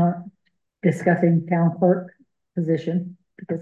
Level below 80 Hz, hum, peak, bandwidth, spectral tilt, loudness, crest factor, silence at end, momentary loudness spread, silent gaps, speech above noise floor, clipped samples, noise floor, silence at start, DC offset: -70 dBFS; none; -6 dBFS; 7.8 kHz; -9.5 dB/octave; -22 LUFS; 16 dB; 0 s; 14 LU; none; 51 dB; under 0.1%; -71 dBFS; 0 s; under 0.1%